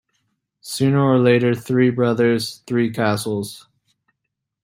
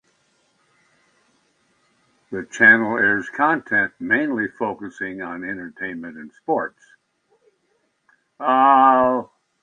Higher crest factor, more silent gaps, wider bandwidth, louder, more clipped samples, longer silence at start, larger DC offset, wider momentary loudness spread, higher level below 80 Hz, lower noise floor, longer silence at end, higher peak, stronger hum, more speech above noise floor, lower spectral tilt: about the same, 16 dB vs 20 dB; neither; first, 16 kHz vs 9.6 kHz; about the same, -18 LUFS vs -19 LUFS; neither; second, 0.65 s vs 2.3 s; neither; second, 10 LU vs 19 LU; first, -60 dBFS vs -66 dBFS; first, -79 dBFS vs -68 dBFS; first, 1.05 s vs 0.4 s; second, -4 dBFS vs 0 dBFS; neither; first, 61 dB vs 49 dB; about the same, -6.5 dB/octave vs -5.5 dB/octave